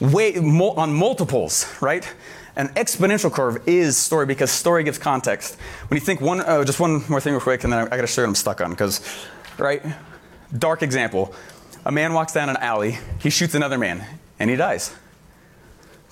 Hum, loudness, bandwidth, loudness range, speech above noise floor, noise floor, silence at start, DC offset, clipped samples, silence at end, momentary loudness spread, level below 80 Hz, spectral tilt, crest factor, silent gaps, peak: none; -20 LUFS; 17 kHz; 4 LU; 29 dB; -50 dBFS; 0 s; under 0.1%; under 0.1%; 1.15 s; 13 LU; -46 dBFS; -4.5 dB/octave; 14 dB; none; -8 dBFS